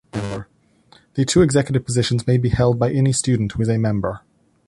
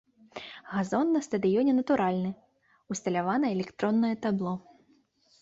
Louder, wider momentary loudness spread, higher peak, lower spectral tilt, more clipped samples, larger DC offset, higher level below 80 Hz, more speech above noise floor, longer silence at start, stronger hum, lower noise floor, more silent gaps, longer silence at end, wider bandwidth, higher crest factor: first, -19 LUFS vs -28 LUFS; second, 12 LU vs 16 LU; first, -4 dBFS vs -14 dBFS; about the same, -6 dB/octave vs -6.5 dB/octave; neither; neither; first, -40 dBFS vs -68 dBFS; about the same, 37 dB vs 39 dB; second, 0.15 s vs 0.35 s; neither; second, -55 dBFS vs -66 dBFS; neither; second, 0.5 s vs 0.8 s; first, 11.5 kHz vs 8 kHz; about the same, 16 dB vs 14 dB